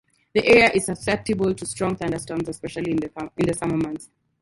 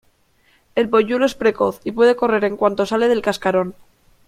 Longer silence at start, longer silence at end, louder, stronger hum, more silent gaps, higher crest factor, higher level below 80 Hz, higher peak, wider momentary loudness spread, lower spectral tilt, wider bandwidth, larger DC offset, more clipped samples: second, 0.35 s vs 0.75 s; second, 0.35 s vs 0.55 s; second, -22 LUFS vs -18 LUFS; neither; neither; first, 22 dB vs 16 dB; about the same, -50 dBFS vs -54 dBFS; about the same, -2 dBFS vs -2 dBFS; first, 14 LU vs 6 LU; about the same, -5 dB/octave vs -5.5 dB/octave; second, 11.5 kHz vs 14.5 kHz; neither; neither